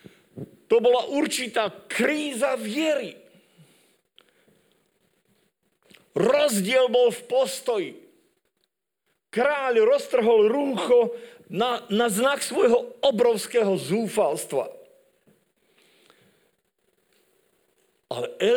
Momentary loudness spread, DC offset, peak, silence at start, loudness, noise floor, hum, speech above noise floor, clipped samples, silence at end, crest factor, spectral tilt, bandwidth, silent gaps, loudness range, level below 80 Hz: 13 LU; under 0.1%; -6 dBFS; 0.35 s; -23 LUFS; -76 dBFS; none; 54 dB; under 0.1%; 0 s; 20 dB; -4 dB/octave; 19.5 kHz; none; 10 LU; -72 dBFS